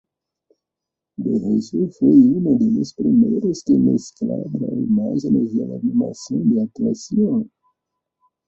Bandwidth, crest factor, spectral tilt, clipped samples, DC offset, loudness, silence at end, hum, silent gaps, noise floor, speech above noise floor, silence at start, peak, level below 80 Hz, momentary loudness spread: 7.8 kHz; 16 dB; -9 dB/octave; under 0.1%; under 0.1%; -19 LUFS; 1 s; none; none; -84 dBFS; 67 dB; 1.2 s; -2 dBFS; -58 dBFS; 10 LU